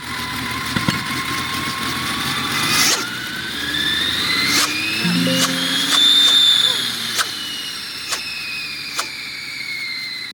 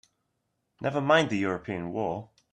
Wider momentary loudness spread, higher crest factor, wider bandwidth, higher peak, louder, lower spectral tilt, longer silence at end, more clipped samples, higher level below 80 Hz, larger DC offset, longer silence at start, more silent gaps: about the same, 13 LU vs 11 LU; about the same, 18 dB vs 20 dB; first, 19 kHz vs 9.6 kHz; first, -2 dBFS vs -8 dBFS; first, -17 LUFS vs -28 LUFS; second, -1.5 dB/octave vs -5.5 dB/octave; second, 0 s vs 0.25 s; neither; first, -50 dBFS vs -66 dBFS; neither; second, 0 s vs 0.8 s; neither